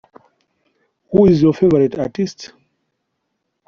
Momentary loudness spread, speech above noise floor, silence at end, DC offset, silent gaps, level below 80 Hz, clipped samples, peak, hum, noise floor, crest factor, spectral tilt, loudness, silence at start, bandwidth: 17 LU; 59 dB; 1.2 s; under 0.1%; none; -48 dBFS; under 0.1%; -2 dBFS; none; -73 dBFS; 16 dB; -8 dB/octave; -15 LUFS; 1.1 s; 7.2 kHz